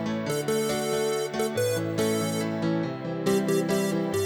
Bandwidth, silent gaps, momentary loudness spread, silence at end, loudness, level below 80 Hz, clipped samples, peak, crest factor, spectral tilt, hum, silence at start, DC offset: over 20 kHz; none; 4 LU; 0 s; -27 LUFS; -62 dBFS; under 0.1%; -12 dBFS; 14 dB; -5 dB/octave; none; 0 s; under 0.1%